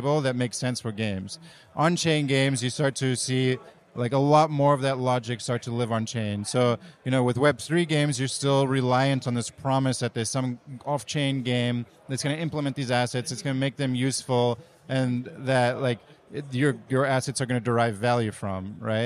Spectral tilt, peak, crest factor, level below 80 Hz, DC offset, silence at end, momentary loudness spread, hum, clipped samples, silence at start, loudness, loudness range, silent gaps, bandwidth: -5.5 dB/octave; -8 dBFS; 18 dB; -64 dBFS; under 0.1%; 0 s; 9 LU; none; under 0.1%; 0 s; -26 LUFS; 3 LU; none; 13 kHz